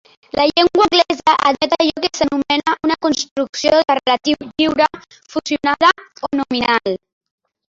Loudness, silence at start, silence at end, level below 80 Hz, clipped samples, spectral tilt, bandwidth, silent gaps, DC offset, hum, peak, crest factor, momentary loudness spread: -16 LUFS; 0.35 s; 0.75 s; -52 dBFS; under 0.1%; -3 dB/octave; 7.8 kHz; 3.31-3.36 s, 3.49-3.53 s; under 0.1%; none; 0 dBFS; 16 dB; 9 LU